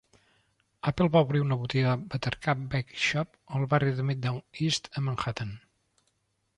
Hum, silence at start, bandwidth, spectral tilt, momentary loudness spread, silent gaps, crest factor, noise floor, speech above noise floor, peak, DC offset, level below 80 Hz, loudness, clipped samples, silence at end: none; 0.85 s; 11 kHz; -6 dB/octave; 10 LU; none; 18 dB; -75 dBFS; 47 dB; -10 dBFS; under 0.1%; -56 dBFS; -29 LUFS; under 0.1%; 1 s